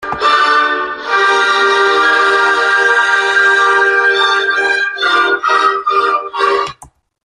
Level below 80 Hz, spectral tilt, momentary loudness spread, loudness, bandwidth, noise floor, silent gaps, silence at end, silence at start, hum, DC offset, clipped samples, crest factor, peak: -54 dBFS; -1 dB/octave; 5 LU; -11 LUFS; 11 kHz; -42 dBFS; none; 0.4 s; 0 s; none; under 0.1%; under 0.1%; 12 dB; 0 dBFS